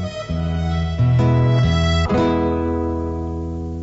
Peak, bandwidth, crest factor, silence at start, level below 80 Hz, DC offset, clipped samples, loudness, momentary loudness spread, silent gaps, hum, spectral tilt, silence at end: -8 dBFS; 7.8 kHz; 10 dB; 0 s; -28 dBFS; under 0.1%; under 0.1%; -19 LUFS; 10 LU; none; none; -7.5 dB/octave; 0 s